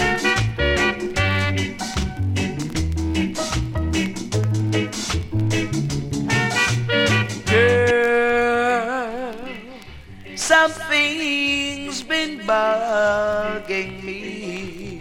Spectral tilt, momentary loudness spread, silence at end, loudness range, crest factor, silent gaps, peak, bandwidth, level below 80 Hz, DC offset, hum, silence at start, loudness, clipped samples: -4.5 dB/octave; 13 LU; 0 s; 5 LU; 18 dB; none; -2 dBFS; 16 kHz; -38 dBFS; under 0.1%; none; 0 s; -20 LUFS; under 0.1%